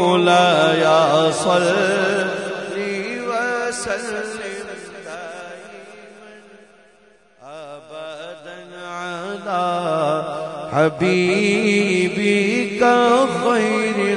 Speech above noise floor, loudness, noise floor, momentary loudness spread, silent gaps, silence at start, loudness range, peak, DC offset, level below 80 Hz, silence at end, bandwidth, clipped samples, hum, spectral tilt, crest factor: 37 dB; -18 LUFS; -53 dBFS; 20 LU; none; 0 s; 20 LU; -4 dBFS; under 0.1%; -62 dBFS; 0 s; 11 kHz; under 0.1%; none; -4.5 dB/octave; 16 dB